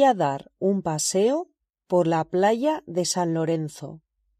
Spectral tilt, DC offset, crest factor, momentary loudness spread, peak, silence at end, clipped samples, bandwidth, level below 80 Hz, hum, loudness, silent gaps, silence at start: -5 dB/octave; under 0.1%; 16 dB; 9 LU; -8 dBFS; 0.45 s; under 0.1%; 14.5 kHz; -68 dBFS; none; -24 LUFS; none; 0 s